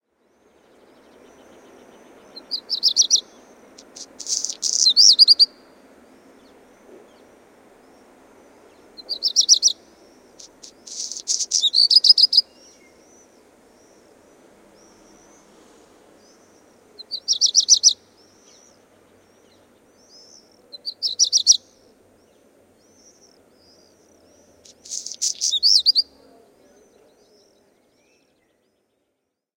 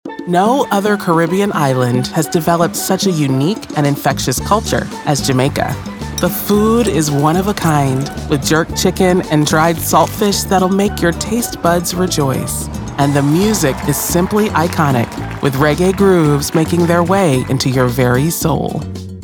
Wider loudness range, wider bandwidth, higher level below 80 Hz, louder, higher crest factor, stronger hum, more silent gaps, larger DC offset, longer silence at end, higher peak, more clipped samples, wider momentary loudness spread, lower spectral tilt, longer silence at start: first, 9 LU vs 2 LU; second, 16.5 kHz vs over 20 kHz; second, -72 dBFS vs -34 dBFS; about the same, -15 LUFS vs -14 LUFS; first, 24 dB vs 12 dB; neither; neither; neither; first, 3.55 s vs 0 s; about the same, 0 dBFS vs 0 dBFS; neither; first, 21 LU vs 6 LU; second, 3.5 dB/octave vs -5 dB/octave; first, 2.35 s vs 0.05 s